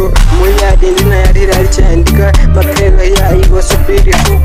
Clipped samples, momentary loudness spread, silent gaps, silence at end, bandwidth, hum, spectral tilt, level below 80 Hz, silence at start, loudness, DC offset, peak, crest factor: under 0.1%; 1 LU; none; 0 s; 16 kHz; none; -5.5 dB/octave; -6 dBFS; 0 s; -9 LUFS; under 0.1%; 0 dBFS; 6 dB